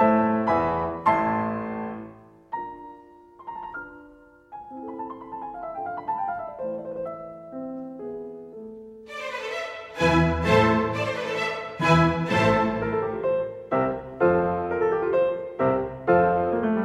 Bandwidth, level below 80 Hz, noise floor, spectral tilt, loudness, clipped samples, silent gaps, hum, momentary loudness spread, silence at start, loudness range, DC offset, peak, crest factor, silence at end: 12 kHz; -48 dBFS; -51 dBFS; -7 dB/octave; -25 LUFS; under 0.1%; none; none; 19 LU; 0 s; 15 LU; under 0.1%; -6 dBFS; 20 dB; 0 s